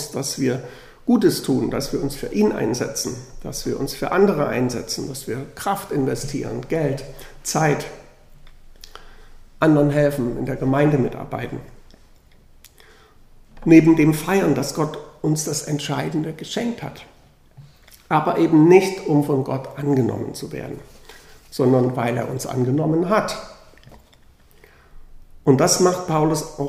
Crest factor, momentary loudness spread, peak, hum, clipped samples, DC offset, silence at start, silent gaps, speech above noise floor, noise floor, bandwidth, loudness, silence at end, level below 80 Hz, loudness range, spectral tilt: 20 dB; 14 LU; 0 dBFS; none; under 0.1%; under 0.1%; 0 s; none; 31 dB; -51 dBFS; 15.5 kHz; -20 LUFS; 0 s; -44 dBFS; 6 LU; -5.5 dB/octave